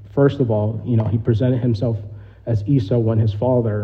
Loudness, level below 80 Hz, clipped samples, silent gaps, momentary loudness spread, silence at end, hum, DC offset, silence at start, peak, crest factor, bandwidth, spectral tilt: -19 LUFS; -46 dBFS; under 0.1%; none; 7 LU; 0 s; none; under 0.1%; 0 s; -4 dBFS; 14 dB; 5.4 kHz; -10.5 dB/octave